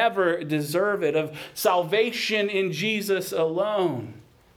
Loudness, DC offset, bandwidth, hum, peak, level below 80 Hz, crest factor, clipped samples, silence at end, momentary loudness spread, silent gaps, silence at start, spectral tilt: -24 LUFS; under 0.1%; 19.5 kHz; none; -8 dBFS; -68 dBFS; 16 dB; under 0.1%; 0.35 s; 6 LU; none; 0 s; -4.5 dB/octave